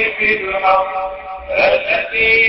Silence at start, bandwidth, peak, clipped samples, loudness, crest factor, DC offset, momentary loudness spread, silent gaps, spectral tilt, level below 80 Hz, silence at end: 0 s; 5.8 kHz; -2 dBFS; under 0.1%; -15 LUFS; 14 dB; under 0.1%; 10 LU; none; -8 dB/octave; -44 dBFS; 0 s